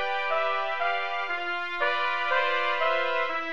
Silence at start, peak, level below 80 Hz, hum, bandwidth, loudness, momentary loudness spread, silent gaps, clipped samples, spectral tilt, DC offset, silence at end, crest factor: 0 s; -12 dBFS; -68 dBFS; none; 8.2 kHz; -26 LUFS; 4 LU; none; under 0.1%; -2.5 dB/octave; 1%; 0 s; 16 dB